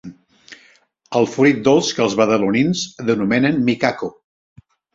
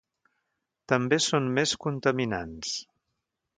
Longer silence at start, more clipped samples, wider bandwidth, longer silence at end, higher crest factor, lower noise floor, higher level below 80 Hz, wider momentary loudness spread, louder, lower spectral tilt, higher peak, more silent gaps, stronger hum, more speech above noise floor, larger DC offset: second, 0.05 s vs 0.9 s; neither; second, 7.8 kHz vs 9.6 kHz; about the same, 0.85 s vs 0.75 s; second, 16 dB vs 22 dB; second, -54 dBFS vs -82 dBFS; about the same, -56 dBFS vs -60 dBFS; about the same, 7 LU vs 9 LU; first, -17 LUFS vs -27 LUFS; about the same, -5 dB/octave vs -4 dB/octave; first, -2 dBFS vs -8 dBFS; neither; neither; second, 38 dB vs 55 dB; neither